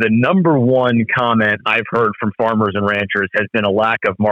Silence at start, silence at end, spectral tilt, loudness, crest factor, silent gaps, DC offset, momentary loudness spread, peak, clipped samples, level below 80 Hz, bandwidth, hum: 0 s; 0 s; -8 dB/octave; -15 LUFS; 10 dB; none; under 0.1%; 4 LU; -4 dBFS; under 0.1%; -58 dBFS; 6.4 kHz; none